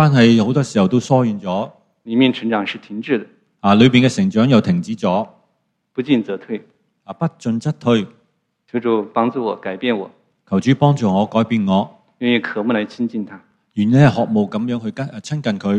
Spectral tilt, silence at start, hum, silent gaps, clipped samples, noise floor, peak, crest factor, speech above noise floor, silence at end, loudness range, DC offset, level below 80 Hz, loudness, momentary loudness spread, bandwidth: -7 dB/octave; 0 s; none; none; under 0.1%; -68 dBFS; 0 dBFS; 16 dB; 51 dB; 0 s; 5 LU; under 0.1%; -58 dBFS; -17 LUFS; 14 LU; 9.4 kHz